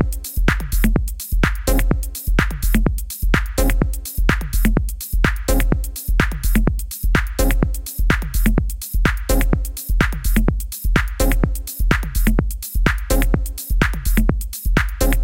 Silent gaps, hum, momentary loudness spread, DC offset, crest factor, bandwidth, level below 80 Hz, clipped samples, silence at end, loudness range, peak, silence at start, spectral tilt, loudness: none; none; 4 LU; 0.2%; 16 dB; 17.5 kHz; -18 dBFS; under 0.1%; 0 s; 0 LU; -2 dBFS; 0 s; -5 dB/octave; -20 LUFS